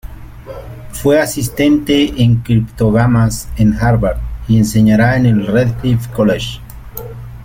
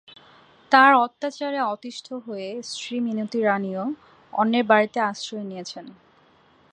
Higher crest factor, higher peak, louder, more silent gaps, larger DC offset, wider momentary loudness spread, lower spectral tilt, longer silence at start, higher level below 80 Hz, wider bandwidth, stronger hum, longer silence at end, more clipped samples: second, 12 dB vs 22 dB; about the same, -2 dBFS vs -2 dBFS; first, -13 LUFS vs -22 LUFS; neither; neither; about the same, 18 LU vs 18 LU; first, -6.5 dB/octave vs -4.5 dB/octave; second, 0.05 s vs 0.7 s; first, -30 dBFS vs -76 dBFS; first, 17 kHz vs 10 kHz; neither; second, 0 s vs 0.8 s; neither